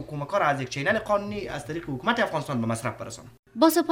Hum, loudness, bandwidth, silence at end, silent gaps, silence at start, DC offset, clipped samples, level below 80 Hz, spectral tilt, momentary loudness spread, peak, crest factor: none; -26 LUFS; 16 kHz; 0 s; 3.39-3.43 s; 0 s; under 0.1%; under 0.1%; -56 dBFS; -5 dB/octave; 13 LU; -6 dBFS; 20 dB